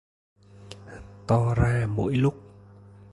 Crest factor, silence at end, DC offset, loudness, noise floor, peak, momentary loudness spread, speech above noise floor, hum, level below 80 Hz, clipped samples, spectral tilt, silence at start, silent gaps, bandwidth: 18 dB; 0.75 s; under 0.1%; -25 LUFS; -49 dBFS; -8 dBFS; 22 LU; 26 dB; none; -42 dBFS; under 0.1%; -8 dB/octave; 0.6 s; none; 11 kHz